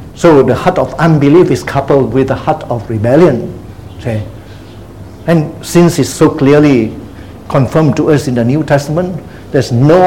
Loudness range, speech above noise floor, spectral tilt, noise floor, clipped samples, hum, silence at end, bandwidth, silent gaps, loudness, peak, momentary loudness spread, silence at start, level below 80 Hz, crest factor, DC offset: 4 LU; 21 dB; -7 dB/octave; -30 dBFS; 0.8%; none; 0 s; 16.5 kHz; none; -10 LUFS; 0 dBFS; 18 LU; 0 s; -36 dBFS; 10 dB; 0.8%